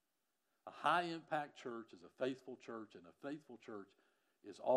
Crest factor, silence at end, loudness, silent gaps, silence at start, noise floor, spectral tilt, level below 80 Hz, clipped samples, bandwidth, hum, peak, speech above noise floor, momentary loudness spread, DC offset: 24 dB; 0 s; -44 LUFS; none; 0.65 s; -88 dBFS; -5 dB/octave; under -90 dBFS; under 0.1%; 13.5 kHz; none; -20 dBFS; 45 dB; 22 LU; under 0.1%